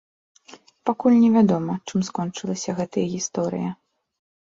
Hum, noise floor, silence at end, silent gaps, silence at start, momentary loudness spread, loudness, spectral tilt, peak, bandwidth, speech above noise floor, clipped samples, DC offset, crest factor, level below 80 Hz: none; -50 dBFS; 0.75 s; none; 0.5 s; 13 LU; -22 LUFS; -6 dB/octave; -6 dBFS; 7.8 kHz; 28 dB; under 0.1%; under 0.1%; 18 dB; -64 dBFS